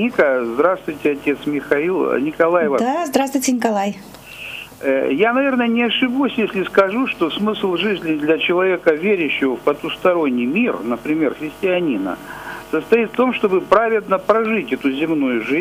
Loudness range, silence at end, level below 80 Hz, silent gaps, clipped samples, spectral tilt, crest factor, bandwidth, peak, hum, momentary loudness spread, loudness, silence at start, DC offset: 2 LU; 0 s; -54 dBFS; none; under 0.1%; -4.5 dB/octave; 16 dB; 15.5 kHz; -2 dBFS; none; 7 LU; -18 LUFS; 0 s; under 0.1%